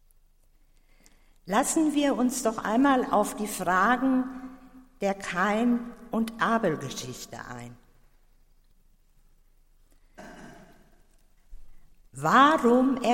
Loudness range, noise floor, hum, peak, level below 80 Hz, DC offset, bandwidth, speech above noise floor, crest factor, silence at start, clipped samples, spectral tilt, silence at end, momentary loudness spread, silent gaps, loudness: 12 LU; -60 dBFS; none; -8 dBFS; -56 dBFS; under 0.1%; 16.5 kHz; 35 dB; 20 dB; 1.45 s; under 0.1%; -4.5 dB/octave; 0 s; 20 LU; none; -25 LUFS